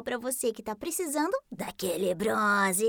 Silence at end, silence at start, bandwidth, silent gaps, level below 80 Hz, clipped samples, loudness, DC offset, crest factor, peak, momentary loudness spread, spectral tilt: 0 s; 0 s; over 20 kHz; none; -66 dBFS; under 0.1%; -29 LUFS; under 0.1%; 16 dB; -14 dBFS; 9 LU; -3.5 dB/octave